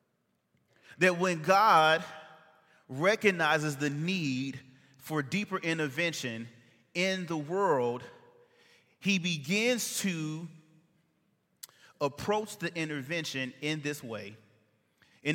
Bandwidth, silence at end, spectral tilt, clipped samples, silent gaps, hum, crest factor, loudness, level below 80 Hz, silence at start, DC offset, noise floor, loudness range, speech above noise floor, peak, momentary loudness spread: 17 kHz; 0 s; -4 dB/octave; under 0.1%; none; none; 24 dB; -30 LUFS; -76 dBFS; 0.9 s; under 0.1%; -77 dBFS; 8 LU; 47 dB; -8 dBFS; 18 LU